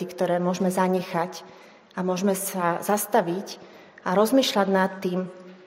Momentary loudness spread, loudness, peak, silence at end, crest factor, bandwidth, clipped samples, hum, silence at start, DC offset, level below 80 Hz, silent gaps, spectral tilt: 14 LU; -24 LUFS; -6 dBFS; 0.1 s; 18 dB; 16 kHz; under 0.1%; none; 0 s; under 0.1%; -76 dBFS; none; -5 dB/octave